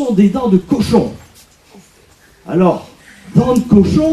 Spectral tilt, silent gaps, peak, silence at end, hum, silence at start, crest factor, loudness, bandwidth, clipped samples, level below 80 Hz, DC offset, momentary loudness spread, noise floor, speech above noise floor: -8 dB/octave; none; 0 dBFS; 0 s; none; 0 s; 14 dB; -13 LUFS; 13 kHz; under 0.1%; -38 dBFS; under 0.1%; 8 LU; -47 dBFS; 35 dB